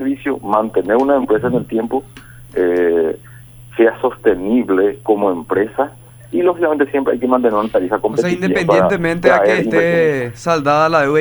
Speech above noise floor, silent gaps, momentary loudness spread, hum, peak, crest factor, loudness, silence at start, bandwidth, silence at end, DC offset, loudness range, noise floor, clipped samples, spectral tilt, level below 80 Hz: 24 dB; none; 7 LU; none; 0 dBFS; 14 dB; -15 LUFS; 0 s; over 20 kHz; 0 s; under 0.1%; 3 LU; -38 dBFS; under 0.1%; -6.5 dB/octave; -46 dBFS